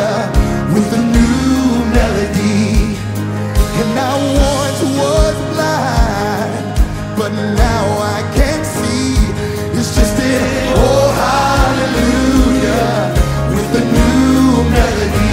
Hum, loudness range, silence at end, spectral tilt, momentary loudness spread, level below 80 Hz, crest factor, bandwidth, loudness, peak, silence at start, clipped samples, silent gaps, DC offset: none; 3 LU; 0 s; -5.5 dB/octave; 6 LU; -18 dBFS; 12 dB; 16.5 kHz; -14 LUFS; 0 dBFS; 0 s; under 0.1%; none; under 0.1%